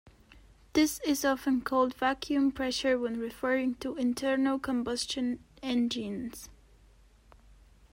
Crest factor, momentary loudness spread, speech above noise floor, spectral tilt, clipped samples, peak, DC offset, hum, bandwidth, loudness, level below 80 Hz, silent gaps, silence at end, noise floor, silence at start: 16 dB; 7 LU; 30 dB; -3.5 dB/octave; under 0.1%; -14 dBFS; under 0.1%; none; 16 kHz; -30 LUFS; -58 dBFS; none; 1.4 s; -59 dBFS; 0.35 s